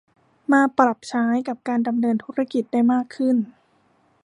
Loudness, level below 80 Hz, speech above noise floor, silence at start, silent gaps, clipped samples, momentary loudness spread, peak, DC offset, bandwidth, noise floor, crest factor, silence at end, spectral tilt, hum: -21 LUFS; -74 dBFS; 41 dB; 0.5 s; none; under 0.1%; 6 LU; -2 dBFS; under 0.1%; 10.5 kHz; -62 dBFS; 20 dB; 0.75 s; -6 dB/octave; none